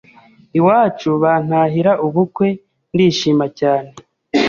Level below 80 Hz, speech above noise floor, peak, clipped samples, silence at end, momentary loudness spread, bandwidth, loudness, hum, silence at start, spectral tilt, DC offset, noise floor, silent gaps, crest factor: -56 dBFS; 32 dB; -2 dBFS; under 0.1%; 0 s; 7 LU; 7.4 kHz; -16 LUFS; none; 0.55 s; -6.5 dB/octave; under 0.1%; -47 dBFS; none; 14 dB